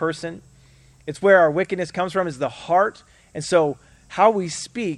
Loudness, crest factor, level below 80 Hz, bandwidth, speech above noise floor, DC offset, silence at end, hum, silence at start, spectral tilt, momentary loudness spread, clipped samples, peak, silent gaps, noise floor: -20 LUFS; 20 dB; -58 dBFS; 11.5 kHz; 31 dB; under 0.1%; 0 s; none; 0 s; -5 dB/octave; 18 LU; under 0.1%; -2 dBFS; none; -52 dBFS